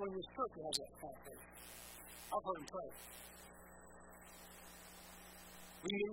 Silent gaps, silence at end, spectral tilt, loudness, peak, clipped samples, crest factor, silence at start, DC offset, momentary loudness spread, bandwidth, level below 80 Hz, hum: none; 0 s; -3 dB/octave; -48 LUFS; -22 dBFS; under 0.1%; 26 dB; 0 s; under 0.1%; 15 LU; 16.5 kHz; -68 dBFS; 60 Hz at -65 dBFS